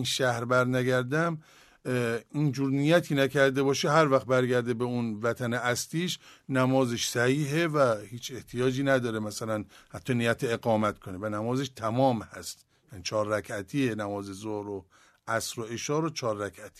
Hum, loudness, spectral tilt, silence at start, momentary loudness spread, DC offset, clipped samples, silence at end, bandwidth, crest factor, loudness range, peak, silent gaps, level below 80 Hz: none; -28 LUFS; -5 dB/octave; 0 s; 12 LU; under 0.1%; under 0.1%; 0.1 s; 13.5 kHz; 20 dB; 6 LU; -8 dBFS; none; -64 dBFS